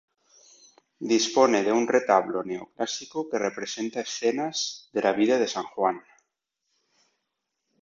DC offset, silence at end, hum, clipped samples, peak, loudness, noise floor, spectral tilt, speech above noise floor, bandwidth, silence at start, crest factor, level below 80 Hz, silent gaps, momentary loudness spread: under 0.1%; 1.85 s; none; under 0.1%; -6 dBFS; -25 LUFS; -81 dBFS; -3 dB/octave; 56 dB; 7.8 kHz; 1 s; 22 dB; -74 dBFS; none; 11 LU